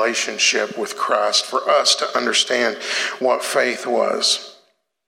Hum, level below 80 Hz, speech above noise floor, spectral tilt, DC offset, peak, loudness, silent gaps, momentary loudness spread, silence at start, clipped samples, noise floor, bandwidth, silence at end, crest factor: none; -88 dBFS; 40 dB; 0 dB/octave; under 0.1%; -4 dBFS; -18 LUFS; none; 6 LU; 0 s; under 0.1%; -60 dBFS; 16.5 kHz; 0.55 s; 16 dB